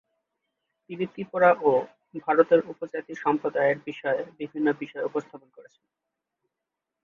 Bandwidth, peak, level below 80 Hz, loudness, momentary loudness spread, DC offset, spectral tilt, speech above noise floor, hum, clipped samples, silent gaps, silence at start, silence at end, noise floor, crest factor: 7 kHz; -4 dBFS; -74 dBFS; -26 LUFS; 14 LU; under 0.1%; -7.5 dB/octave; 60 dB; none; under 0.1%; none; 0.9 s; 1.4 s; -86 dBFS; 22 dB